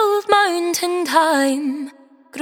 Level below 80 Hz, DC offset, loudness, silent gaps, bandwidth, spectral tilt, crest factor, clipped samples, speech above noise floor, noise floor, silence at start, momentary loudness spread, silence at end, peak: -68 dBFS; under 0.1%; -17 LUFS; none; 19.5 kHz; -1.5 dB/octave; 16 dB; under 0.1%; 24 dB; -42 dBFS; 0 s; 15 LU; 0 s; -2 dBFS